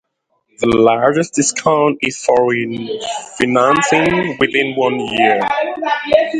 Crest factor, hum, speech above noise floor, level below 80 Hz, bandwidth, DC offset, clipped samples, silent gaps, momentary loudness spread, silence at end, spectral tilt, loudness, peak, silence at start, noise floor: 14 dB; none; 52 dB; -48 dBFS; 11.5 kHz; under 0.1%; under 0.1%; none; 8 LU; 0 s; -4 dB/octave; -15 LUFS; 0 dBFS; 0.6 s; -66 dBFS